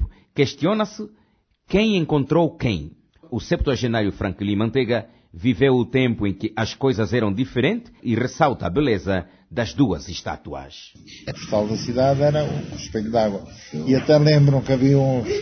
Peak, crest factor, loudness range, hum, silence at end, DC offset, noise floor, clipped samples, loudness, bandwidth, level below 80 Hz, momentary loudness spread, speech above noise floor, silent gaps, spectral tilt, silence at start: -4 dBFS; 18 dB; 4 LU; none; 0 s; under 0.1%; -62 dBFS; under 0.1%; -21 LUFS; 6.6 kHz; -40 dBFS; 14 LU; 41 dB; none; -7 dB/octave; 0 s